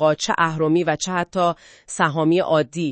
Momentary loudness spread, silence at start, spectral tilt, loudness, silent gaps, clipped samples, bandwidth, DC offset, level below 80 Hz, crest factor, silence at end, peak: 5 LU; 0 s; -5 dB/octave; -20 LUFS; none; under 0.1%; 8.8 kHz; under 0.1%; -58 dBFS; 18 dB; 0 s; -2 dBFS